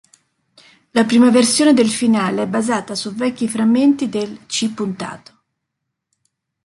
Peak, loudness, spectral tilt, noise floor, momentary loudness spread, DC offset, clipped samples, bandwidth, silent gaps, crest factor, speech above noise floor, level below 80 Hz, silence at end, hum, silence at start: -2 dBFS; -16 LUFS; -4 dB/octave; -78 dBFS; 12 LU; under 0.1%; under 0.1%; 11.5 kHz; none; 16 dB; 62 dB; -62 dBFS; 1.5 s; none; 0.95 s